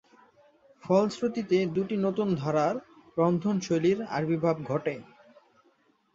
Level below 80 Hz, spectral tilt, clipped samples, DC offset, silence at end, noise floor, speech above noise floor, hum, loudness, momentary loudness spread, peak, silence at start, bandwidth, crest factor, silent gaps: -68 dBFS; -7 dB/octave; under 0.1%; under 0.1%; 1.1 s; -67 dBFS; 40 dB; none; -28 LUFS; 8 LU; -10 dBFS; 0.85 s; 7.8 kHz; 18 dB; none